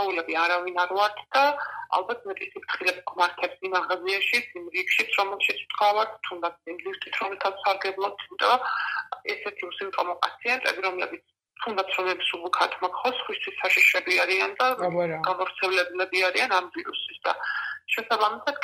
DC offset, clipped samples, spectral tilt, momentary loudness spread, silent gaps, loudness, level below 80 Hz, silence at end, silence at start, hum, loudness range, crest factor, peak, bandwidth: under 0.1%; under 0.1%; -2.5 dB/octave; 10 LU; none; -25 LUFS; -78 dBFS; 0 s; 0 s; none; 5 LU; 22 dB; -4 dBFS; 15.5 kHz